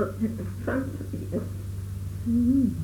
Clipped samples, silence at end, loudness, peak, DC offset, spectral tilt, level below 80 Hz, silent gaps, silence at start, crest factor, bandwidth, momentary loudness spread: under 0.1%; 0 s; -29 LUFS; -14 dBFS; under 0.1%; -8.5 dB/octave; -42 dBFS; none; 0 s; 14 dB; 18.5 kHz; 12 LU